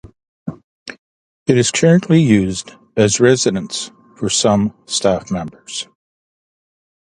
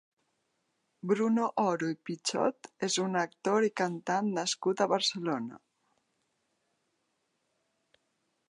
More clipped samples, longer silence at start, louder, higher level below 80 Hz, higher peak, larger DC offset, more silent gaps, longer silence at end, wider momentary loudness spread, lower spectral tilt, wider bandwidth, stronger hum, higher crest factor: neither; second, 0.05 s vs 1.05 s; first, -16 LUFS vs -31 LUFS; first, -48 dBFS vs -84 dBFS; first, 0 dBFS vs -12 dBFS; neither; first, 0.28-0.46 s, 0.64-0.86 s, 0.98-1.46 s vs none; second, 1.2 s vs 2.9 s; first, 19 LU vs 7 LU; about the same, -4.5 dB/octave vs -4 dB/octave; about the same, 11.5 kHz vs 11 kHz; neither; about the same, 18 dB vs 20 dB